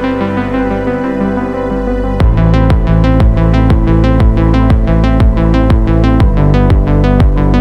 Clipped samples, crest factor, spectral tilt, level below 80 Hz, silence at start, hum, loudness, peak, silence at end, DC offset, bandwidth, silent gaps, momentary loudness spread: under 0.1%; 8 dB; -9 dB/octave; -12 dBFS; 0 s; 50 Hz at -25 dBFS; -11 LUFS; 0 dBFS; 0 s; under 0.1%; 6 kHz; none; 5 LU